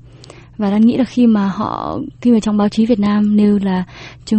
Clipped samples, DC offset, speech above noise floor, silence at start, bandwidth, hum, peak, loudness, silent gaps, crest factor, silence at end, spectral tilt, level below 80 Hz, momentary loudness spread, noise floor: under 0.1%; under 0.1%; 25 dB; 0.6 s; 8.6 kHz; none; -2 dBFS; -15 LUFS; none; 12 dB; 0 s; -7.5 dB/octave; -44 dBFS; 9 LU; -39 dBFS